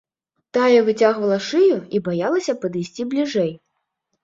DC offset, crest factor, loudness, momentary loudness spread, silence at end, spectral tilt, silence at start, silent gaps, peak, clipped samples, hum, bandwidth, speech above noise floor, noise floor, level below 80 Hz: under 0.1%; 16 dB; -19 LUFS; 10 LU; 0.7 s; -5.5 dB/octave; 0.55 s; none; -4 dBFS; under 0.1%; none; 7.8 kHz; 56 dB; -75 dBFS; -66 dBFS